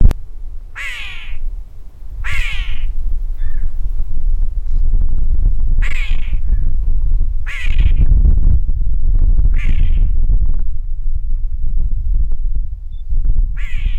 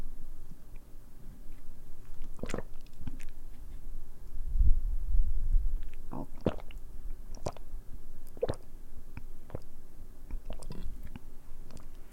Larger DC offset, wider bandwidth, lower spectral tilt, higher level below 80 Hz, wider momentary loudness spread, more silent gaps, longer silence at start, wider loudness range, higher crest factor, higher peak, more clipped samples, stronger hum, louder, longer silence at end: neither; second, 3.9 kHz vs 7.4 kHz; about the same, -6 dB/octave vs -7 dB/octave; first, -12 dBFS vs -34 dBFS; second, 11 LU vs 18 LU; neither; about the same, 0 s vs 0 s; second, 7 LU vs 11 LU; second, 10 dB vs 20 dB; first, 0 dBFS vs -10 dBFS; neither; neither; first, -21 LUFS vs -41 LUFS; about the same, 0 s vs 0 s